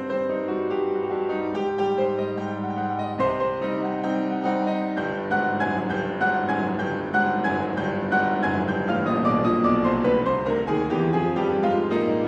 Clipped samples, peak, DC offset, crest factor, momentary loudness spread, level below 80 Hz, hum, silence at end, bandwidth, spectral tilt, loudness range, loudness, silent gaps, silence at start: under 0.1%; -10 dBFS; under 0.1%; 14 dB; 5 LU; -52 dBFS; none; 0 s; 8.2 kHz; -8 dB/octave; 3 LU; -24 LUFS; none; 0 s